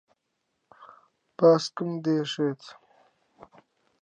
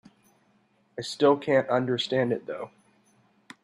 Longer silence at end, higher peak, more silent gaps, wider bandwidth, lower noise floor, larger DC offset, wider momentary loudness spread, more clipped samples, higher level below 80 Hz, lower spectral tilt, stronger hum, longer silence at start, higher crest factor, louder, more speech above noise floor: first, 1.3 s vs 0.95 s; about the same, -8 dBFS vs -10 dBFS; neither; second, 9.4 kHz vs 12 kHz; first, -78 dBFS vs -66 dBFS; neither; about the same, 16 LU vs 15 LU; neither; second, -80 dBFS vs -74 dBFS; about the same, -6 dB/octave vs -5.5 dB/octave; neither; second, 0.8 s vs 0.95 s; about the same, 20 dB vs 20 dB; about the same, -25 LUFS vs -26 LUFS; first, 54 dB vs 41 dB